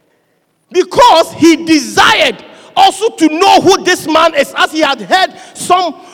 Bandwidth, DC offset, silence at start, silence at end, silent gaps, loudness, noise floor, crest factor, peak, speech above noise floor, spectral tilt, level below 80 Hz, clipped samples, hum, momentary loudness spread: 19 kHz; under 0.1%; 0.7 s; 0.2 s; none; -9 LUFS; -58 dBFS; 10 dB; 0 dBFS; 48 dB; -2.5 dB/octave; -46 dBFS; under 0.1%; none; 8 LU